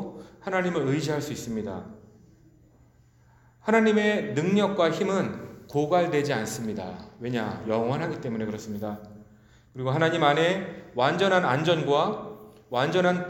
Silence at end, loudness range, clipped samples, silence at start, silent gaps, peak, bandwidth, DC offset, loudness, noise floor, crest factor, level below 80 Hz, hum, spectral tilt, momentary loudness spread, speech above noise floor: 0 s; 7 LU; under 0.1%; 0 s; none; -6 dBFS; 17 kHz; under 0.1%; -26 LUFS; -58 dBFS; 20 dB; -62 dBFS; none; -5.5 dB/octave; 15 LU; 33 dB